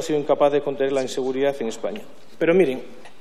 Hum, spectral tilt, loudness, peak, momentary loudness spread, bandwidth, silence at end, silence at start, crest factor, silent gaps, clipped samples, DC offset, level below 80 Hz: none; -5.5 dB/octave; -22 LUFS; -6 dBFS; 12 LU; 13.5 kHz; 0.15 s; 0 s; 16 dB; none; under 0.1%; 2%; -72 dBFS